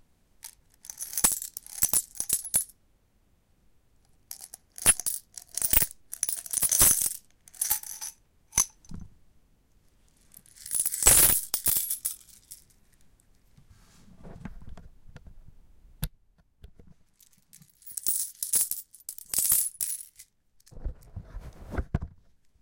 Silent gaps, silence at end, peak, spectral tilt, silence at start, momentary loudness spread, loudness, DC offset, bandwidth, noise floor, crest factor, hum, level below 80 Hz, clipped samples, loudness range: none; 0.5 s; -4 dBFS; -1 dB/octave; 0.45 s; 27 LU; -25 LUFS; under 0.1%; 17.5 kHz; -66 dBFS; 28 dB; none; -46 dBFS; under 0.1%; 22 LU